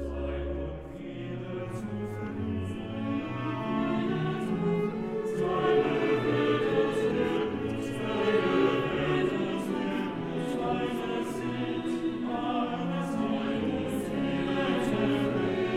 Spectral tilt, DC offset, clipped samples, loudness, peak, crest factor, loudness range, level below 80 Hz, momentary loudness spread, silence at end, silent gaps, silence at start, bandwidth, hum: -7 dB/octave; 0.1%; under 0.1%; -30 LUFS; -14 dBFS; 16 dB; 5 LU; -48 dBFS; 9 LU; 0 s; none; 0 s; 14.5 kHz; none